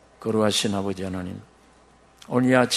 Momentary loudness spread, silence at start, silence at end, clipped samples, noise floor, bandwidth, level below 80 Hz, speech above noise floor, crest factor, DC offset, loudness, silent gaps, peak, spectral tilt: 14 LU; 0.2 s; 0 s; under 0.1%; -55 dBFS; 13 kHz; -60 dBFS; 32 dB; 22 dB; under 0.1%; -24 LUFS; none; -4 dBFS; -4.5 dB/octave